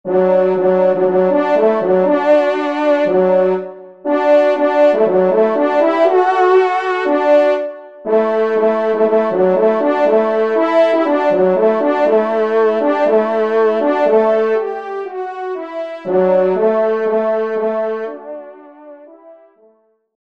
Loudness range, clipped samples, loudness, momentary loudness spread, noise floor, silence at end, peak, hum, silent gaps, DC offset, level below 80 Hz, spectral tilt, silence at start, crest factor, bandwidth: 4 LU; under 0.1%; -14 LUFS; 11 LU; -55 dBFS; 0.95 s; -2 dBFS; none; none; 0.4%; -66 dBFS; -7.5 dB/octave; 0.05 s; 12 dB; 7.4 kHz